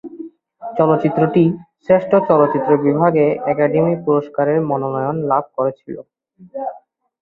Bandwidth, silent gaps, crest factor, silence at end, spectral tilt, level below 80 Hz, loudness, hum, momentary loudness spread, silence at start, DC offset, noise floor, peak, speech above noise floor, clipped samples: 4.6 kHz; none; 16 dB; 0.45 s; -11 dB/octave; -58 dBFS; -16 LUFS; none; 19 LU; 0.05 s; under 0.1%; -44 dBFS; -2 dBFS; 28 dB; under 0.1%